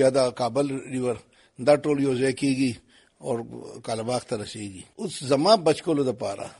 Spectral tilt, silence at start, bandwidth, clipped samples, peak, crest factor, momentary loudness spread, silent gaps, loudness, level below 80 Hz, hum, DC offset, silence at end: -5 dB/octave; 0 s; 11.5 kHz; under 0.1%; -6 dBFS; 20 dB; 16 LU; none; -25 LUFS; -62 dBFS; none; under 0.1%; 0.05 s